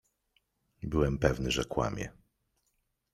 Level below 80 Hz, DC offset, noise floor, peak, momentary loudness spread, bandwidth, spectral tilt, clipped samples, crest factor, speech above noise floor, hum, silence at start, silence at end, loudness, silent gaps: -46 dBFS; under 0.1%; -78 dBFS; -10 dBFS; 14 LU; 14 kHz; -5.5 dB/octave; under 0.1%; 24 dB; 48 dB; none; 0.8 s; 1 s; -31 LUFS; none